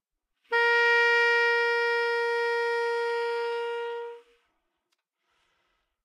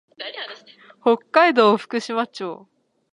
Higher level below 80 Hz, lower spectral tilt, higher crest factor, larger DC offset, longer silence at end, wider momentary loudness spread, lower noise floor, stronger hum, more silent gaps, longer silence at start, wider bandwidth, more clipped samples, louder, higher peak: second, under -90 dBFS vs -78 dBFS; second, 2.5 dB/octave vs -4.5 dB/octave; second, 14 dB vs 20 dB; neither; first, 1.85 s vs 0.6 s; second, 12 LU vs 18 LU; first, -79 dBFS vs -49 dBFS; neither; neither; first, 0.5 s vs 0.2 s; about the same, 11 kHz vs 10.5 kHz; neither; second, -25 LUFS vs -19 LUFS; second, -14 dBFS vs -2 dBFS